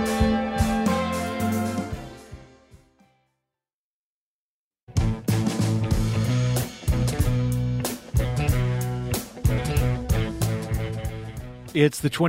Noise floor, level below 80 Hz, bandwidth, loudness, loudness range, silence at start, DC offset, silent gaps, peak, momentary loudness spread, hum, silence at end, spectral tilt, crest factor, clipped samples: under -90 dBFS; -34 dBFS; 16 kHz; -25 LUFS; 9 LU; 0 s; under 0.1%; 3.73-4.71 s, 4.81-4.87 s; -4 dBFS; 9 LU; none; 0 s; -6 dB/octave; 20 dB; under 0.1%